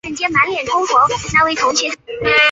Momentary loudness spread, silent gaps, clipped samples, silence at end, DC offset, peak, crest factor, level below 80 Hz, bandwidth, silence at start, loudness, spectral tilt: 5 LU; none; under 0.1%; 0 s; under 0.1%; 0 dBFS; 16 dB; -44 dBFS; 8 kHz; 0.05 s; -15 LUFS; -2 dB/octave